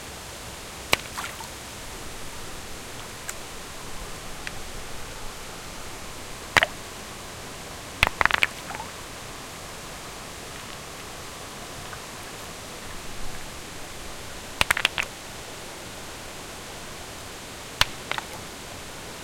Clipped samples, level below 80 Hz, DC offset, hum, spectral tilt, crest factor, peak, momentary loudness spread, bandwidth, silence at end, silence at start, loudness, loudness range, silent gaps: under 0.1%; -46 dBFS; under 0.1%; none; -2 dB/octave; 32 dB; 0 dBFS; 15 LU; 16.5 kHz; 0 s; 0 s; -31 LUFS; 11 LU; none